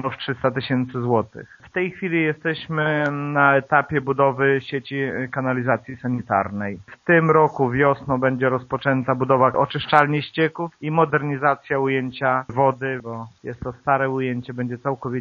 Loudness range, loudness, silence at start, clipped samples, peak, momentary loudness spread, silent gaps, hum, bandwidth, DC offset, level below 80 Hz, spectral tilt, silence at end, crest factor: 4 LU; -21 LUFS; 0 s; under 0.1%; 0 dBFS; 10 LU; none; none; 7.2 kHz; under 0.1%; -56 dBFS; -5 dB/octave; 0 s; 22 dB